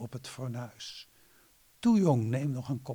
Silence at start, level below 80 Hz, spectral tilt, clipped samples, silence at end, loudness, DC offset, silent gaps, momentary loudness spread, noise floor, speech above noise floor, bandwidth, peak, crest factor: 0 s; -68 dBFS; -7 dB/octave; under 0.1%; 0 s; -30 LUFS; under 0.1%; none; 18 LU; -63 dBFS; 33 dB; 20 kHz; -14 dBFS; 18 dB